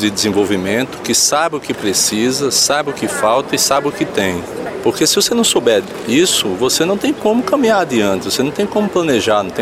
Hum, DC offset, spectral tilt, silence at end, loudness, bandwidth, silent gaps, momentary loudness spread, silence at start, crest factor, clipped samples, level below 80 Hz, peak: none; under 0.1%; -2.5 dB/octave; 0 s; -14 LUFS; 16 kHz; none; 6 LU; 0 s; 12 dB; under 0.1%; -50 dBFS; -2 dBFS